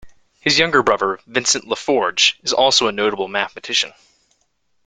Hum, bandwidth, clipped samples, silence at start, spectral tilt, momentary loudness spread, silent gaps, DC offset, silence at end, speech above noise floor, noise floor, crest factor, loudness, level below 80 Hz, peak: none; 9.6 kHz; under 0.1%; 0.05 s; -1.5 dB/octave; 8 LU; none; under 0.1%; 0.95 s; 50 dB; -68 dBFS; 20 dB; -17 LUFS; -56 dBFS; 0 dBFS